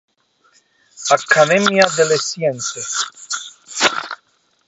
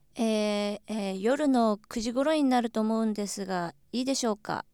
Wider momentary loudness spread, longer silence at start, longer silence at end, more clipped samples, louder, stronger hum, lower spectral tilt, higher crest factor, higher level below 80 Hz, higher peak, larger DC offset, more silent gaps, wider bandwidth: first, 14 LU vs 8 LU; first, 0.95 s vs 0.15 s; first, 0.55 s vs 0.1 s; neither; first, -16 LUFS vs -28 LUFS; neither; second, -2.5 dB/octave vs -4.5 dB/octave; about the same, 18 dB vs 16 dB; about the same, -64 dBFS vs -62 dBFS; first, 0 dBFS vs -12 dBFS; neither; neither; second, 8.2 kHz vs 17 kHz